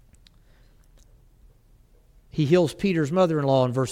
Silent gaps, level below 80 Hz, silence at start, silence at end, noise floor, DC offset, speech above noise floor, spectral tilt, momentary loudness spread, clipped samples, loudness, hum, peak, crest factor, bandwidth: none; -54 dBFS; 2.35 s; 0 s; -56 dBFS; under 0.1%; 35 dB; -7 dB/octave; 5 LU; under 0.1%; -22 LUFS; none; -8 dBFS; 18 dB; 14.5 kHz